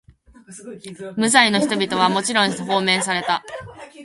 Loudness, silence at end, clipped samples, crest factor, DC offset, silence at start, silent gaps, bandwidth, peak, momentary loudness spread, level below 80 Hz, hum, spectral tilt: -18 LUFS; 0 s; under 0.1%; 20 dB; under 0.1%; 0.5 s; none; 11.5 kHz; 0 dBFS; 22 LU; -60 dBFS; none; -3 dB/octave